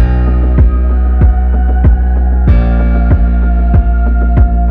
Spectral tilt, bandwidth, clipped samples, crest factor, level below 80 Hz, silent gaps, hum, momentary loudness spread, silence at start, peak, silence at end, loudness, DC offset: -11.5 dB/octave; 3 kHz; 0.2%; 8 dB; -8 dBFS; none; none; 2 LU; 0 s; 0 dBFS; 0 s; -11 LUFS; under 0.1%